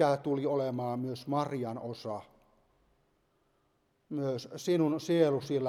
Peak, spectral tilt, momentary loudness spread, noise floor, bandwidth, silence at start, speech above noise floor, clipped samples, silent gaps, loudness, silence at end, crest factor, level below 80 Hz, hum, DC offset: -14 dBFS; -7 dB/octave; 12 LU; -74 dBFS; 15 kHz; 0 s; 43 dB; under 0.1%; none; -32 LUFS; 0 s; 18 dB; -76 dBFS; none; under 0.1%